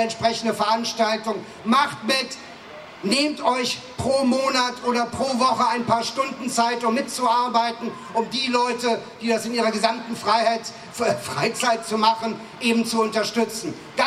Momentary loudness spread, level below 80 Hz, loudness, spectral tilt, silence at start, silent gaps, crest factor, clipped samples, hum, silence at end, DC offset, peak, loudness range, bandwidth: 8 LU; -64 dBFS; -22 LUFS; -3.5 dB/octave; 0 s; none; 20 dB; under 0.1%; none; 0 s; under 0.1%; -2 dBFS; 1 LU; 15 kHz